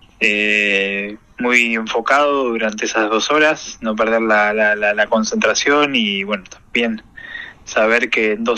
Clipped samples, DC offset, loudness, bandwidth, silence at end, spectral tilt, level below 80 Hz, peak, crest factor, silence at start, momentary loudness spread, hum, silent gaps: under 0.1%; under 0.1%; -16 LUFS; 12.5 kHz; 0 s; -2.5 dB/octave; -52 dBFS; 0 dBFS; 16 dB; 0.2 s; 10 LU; none; none